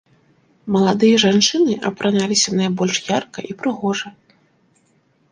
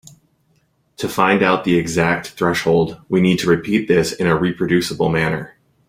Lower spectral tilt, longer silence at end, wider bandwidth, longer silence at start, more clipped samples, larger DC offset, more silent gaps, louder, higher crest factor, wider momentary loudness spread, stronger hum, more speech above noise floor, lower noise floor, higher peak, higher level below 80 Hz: second, -4 dB/octave vs -5.5 dB/octave; first, 1.2 s vs 0.4 s; second, 10 kHz vs 16 kHz; second, 0.65 s vs 1 s; neither; neither; neither; about the same, -17 LUFS vs -17 LUFS; about the same, 18 dB vs 18 dB; first, 12 LU vs 5 LU; neither; about the same, 43 dB vs 45 dB; about the same, -60 dBFS vs -62 dBFS; about the same, 0 dBFS vs 0 dBFS; second, -60 dBFS vs -48 dBFS